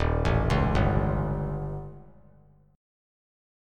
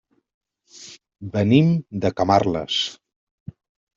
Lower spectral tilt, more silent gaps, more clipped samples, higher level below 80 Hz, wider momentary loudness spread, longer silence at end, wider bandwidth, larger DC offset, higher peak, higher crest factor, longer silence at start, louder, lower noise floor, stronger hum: first, -8 dB/octave vs -6.5 dB/octave; neither; neither; first, -34 dBFS vs -56 dBFS; second, 13 LU vs 24 LU; first, 1.7 s vs 1.05 s; first, 10.5 kHz vs 7.6 kHz; neither; second, -10 dBFS vs -2 dBFS; about the same, 18 dB vs 20 dB; second, 0 s vs 0.75 s; second, -27 LUFS vs -20 LUFS; first, -57 dBFS vs -46 dBFS; first, 50 Hz at -45 dBFS vs none